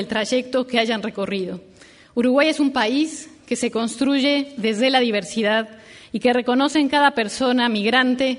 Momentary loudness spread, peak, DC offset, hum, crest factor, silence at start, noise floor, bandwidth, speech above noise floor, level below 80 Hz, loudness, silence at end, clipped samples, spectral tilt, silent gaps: 9 LU; -4 dBFS; under 0.1%; none; 16 dB; 0 s; -43 dBFS; 11 kHz; 23 dB; -60 dBFS; -20 LUFS; 0 s; under 0.1%; -3.5 dB/octave; none